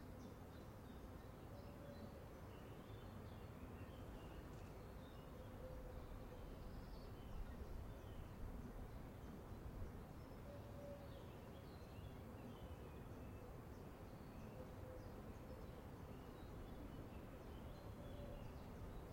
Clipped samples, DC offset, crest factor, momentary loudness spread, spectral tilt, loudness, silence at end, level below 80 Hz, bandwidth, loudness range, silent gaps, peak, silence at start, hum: under 0.1%; under 0.1%; 16 dB; 2 LU; -7 dB/octave; -57 LUFS; 0 s; -60 dBFS; 16.5 kHz; 1 LU; none; -38 dBFS; 0 s; none